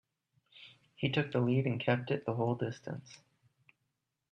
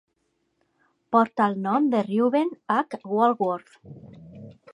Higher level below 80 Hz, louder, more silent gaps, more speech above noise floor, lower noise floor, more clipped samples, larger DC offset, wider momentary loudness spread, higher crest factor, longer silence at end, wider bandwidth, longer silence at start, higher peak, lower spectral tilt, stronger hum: about the same, -74 dBFS vs -70 dBFS; second, -34 LUFS vs -24 LUFS; neither; about the same, 51 dB vs 50 dB; first, -84 dBFS vs -73 dBFS; neither; neither; first, 23 LU vs 7 LU; about the same, 22 dB vs 18 dB; first, 1.15 s vs 0.2 s; second, 7.2 kHz vs 10.5 kHz; second, 0.55 s vs 1.1 s; second, -14 dBFS vs -6 dBFS; about the same, -7.5 dB/octave vs -8 dB/octave; neither